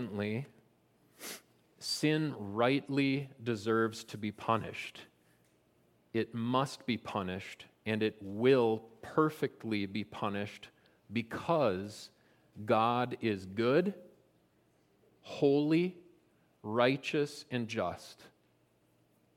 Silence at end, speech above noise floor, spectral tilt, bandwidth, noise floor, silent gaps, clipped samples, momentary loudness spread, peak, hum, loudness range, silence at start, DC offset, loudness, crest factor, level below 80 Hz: 1.1 s; 38 dB; -6 dB/octave; 16.5 kHz; -71 dBFS; none; under 0.1%; 16 LU; -12 dBFS; none; 4 LU; 0 s; under 0.1%; -33 LUFS; 22 dB; -76 dBFS